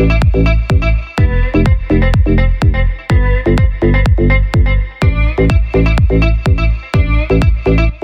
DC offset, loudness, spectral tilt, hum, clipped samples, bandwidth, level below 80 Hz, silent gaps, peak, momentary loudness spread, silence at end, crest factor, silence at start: under 0.1%; -13 LUFS; -8 dB/octave; none; under 0.1%; 7.8 kHz; -12 dBFS; none; -2 dBFS; 3 LU; 0.05 s; 8 dB; 0 s